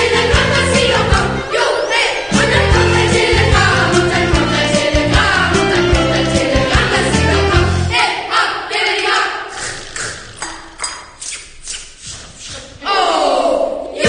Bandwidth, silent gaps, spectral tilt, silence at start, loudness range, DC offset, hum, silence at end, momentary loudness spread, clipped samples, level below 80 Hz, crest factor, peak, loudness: 10 kHz; none; -4 dB/octave; 0 s; 9 LU; under 0.1%; none; 0 s; 15 LU; under 0.1%; -26 dBFS; 14 dB; 0 dBFS; -13 LUFS